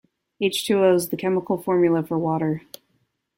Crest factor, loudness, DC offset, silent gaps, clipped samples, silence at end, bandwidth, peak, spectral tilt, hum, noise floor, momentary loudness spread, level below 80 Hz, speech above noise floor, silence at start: 16 dB; -22 LUFS; under 0.1%; none; under 0.1%; 0.8 s; 16.5 kHz; -6 dBFS; -5.5 dB/octave; none; -70 dBFS; 7 LU; -64 dBFS; 49 dB; 0.4 s